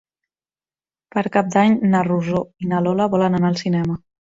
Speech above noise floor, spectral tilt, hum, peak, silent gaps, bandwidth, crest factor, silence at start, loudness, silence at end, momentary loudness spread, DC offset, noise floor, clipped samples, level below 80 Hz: over 72 dB; -7.5 dB/octave; none; -2 dBFS; none; 7.8 kHz; 16 dB; 1.15 s; -19 LUFS; 0.35 s; 8 LU; under 0.1%; under -90 dBFS; under 0.1%; -54 dBFS